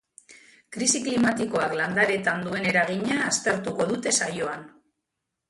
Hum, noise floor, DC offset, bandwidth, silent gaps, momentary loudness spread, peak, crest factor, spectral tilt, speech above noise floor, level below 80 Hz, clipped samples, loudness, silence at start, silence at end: none; -83 dBFS; under 0.1%; 11.5 kHz; none; 6 LU; -6 dBFS; 20 dB; -3 dB/octave; 58 dB; -64 dBFS; under 0.1%; -24 LUFS; 0.3 s; 0.8 s